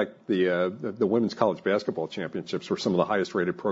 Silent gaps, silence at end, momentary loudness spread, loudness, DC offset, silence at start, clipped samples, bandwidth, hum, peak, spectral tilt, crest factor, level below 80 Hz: none; 0 s; 8 LU; -27 LUFS; under 0.1%; 0 s; under 0.1%; 7.8 kHz; none; -8 dBFS; -6.5 dB/octave; 18 dB; -66 dBFS